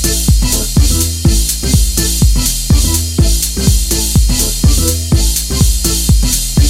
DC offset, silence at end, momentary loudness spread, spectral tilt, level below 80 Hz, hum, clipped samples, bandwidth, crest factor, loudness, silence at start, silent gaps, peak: under 0.1%; 0 s; 1 LU; -4 dB/octave; -14 dBFS; none; under 0.1%; 17 kHz; 10 dB; -12 LUFS; 0 s; none; 0 dBFS